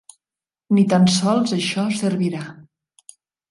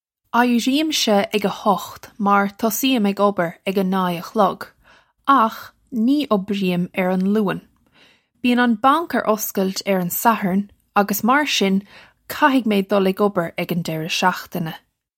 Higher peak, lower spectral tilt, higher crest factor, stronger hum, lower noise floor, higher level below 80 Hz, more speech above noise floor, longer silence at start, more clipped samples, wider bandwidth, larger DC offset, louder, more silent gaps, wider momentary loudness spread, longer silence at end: about the same, -4 dBFS vs -2 dBFS; about the same, -5.5 dB/octave vs -4.5 dB/octave; about the same, 16 dB vs 18 dB; neither; first, under -90 dBFS vs -55 dBFS; about the same, -62 dBFS vs -64 dBFS; first, over 72 dB vs 36 dB; first, 0.7 s vs 0.35 s; neither; second, 11.5 kHz vs 16.5 kHz; neither; about the same, -19 LUFS vs -19 LUFS; neither; about the same, 10 LU vs 8 LU; first, 0.9 s vs 0.4 s